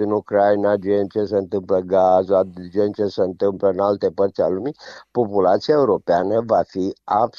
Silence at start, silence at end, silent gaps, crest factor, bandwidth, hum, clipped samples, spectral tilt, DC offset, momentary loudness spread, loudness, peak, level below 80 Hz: 0 s; 0.1 s; none; 14 dB; 7 kHz; none; under 0.1%; -7.5 dB/octave; under 0.1%; 7 LU; -19 LUFS; -4 dBFS; -60 dBFS